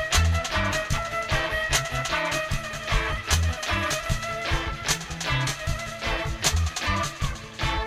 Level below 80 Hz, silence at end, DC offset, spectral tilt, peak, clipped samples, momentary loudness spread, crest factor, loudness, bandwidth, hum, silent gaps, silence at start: -32 dBFS; 0 s; under 0.1%; -3 dB/octave; -8 dBFS; under 0.1%; 6 LU; 18 dB; -26 LUFS; 16 kHz; none; none; 0 s